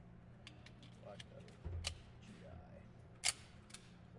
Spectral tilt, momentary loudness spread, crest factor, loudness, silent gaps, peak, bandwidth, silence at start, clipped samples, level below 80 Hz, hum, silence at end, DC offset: -2 dB/octave; 19 LU; 30 dB; -47 LUFS; none; -20 dBFS; 11.5 kHz; 0 s; under 0.1%; -62 dBFS; none; 0 s; under 0.1%